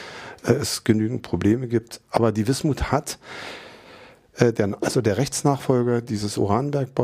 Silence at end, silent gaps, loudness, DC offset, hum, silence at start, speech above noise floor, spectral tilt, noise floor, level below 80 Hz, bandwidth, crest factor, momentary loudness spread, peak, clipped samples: 0 s; none; -23 LUFS; under 0.1%; none; 0 s; 25 dB; -5.5 dB/octave; -47 dBFS; -44 dBFS; 15.5 kHz; 20 dB; 14 LU; -2 dBFS; under 0.1%